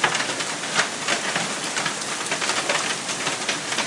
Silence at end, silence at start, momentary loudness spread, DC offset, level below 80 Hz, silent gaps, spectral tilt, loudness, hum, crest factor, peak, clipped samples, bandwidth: 0 s; 0 s; 3 LU; under 0.1%; -68 dBFS; none; -1 dB/octave; -23 LUFS; none; 22 dB; -2 dBFS; under 0.1%; 12 kHz